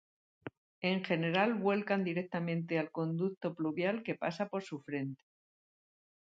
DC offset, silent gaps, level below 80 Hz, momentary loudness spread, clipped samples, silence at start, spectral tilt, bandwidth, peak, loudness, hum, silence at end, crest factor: under 0.1%; 0.57-0.81 s, 3.37-3.41 s; -82 dBFS; 13 LU; under 0.1%; 0.45 s; -7.5 dB/octave; 7.8 kHz; -16 dBFS; -35 LUFS; none; 1.25 s; 20 dB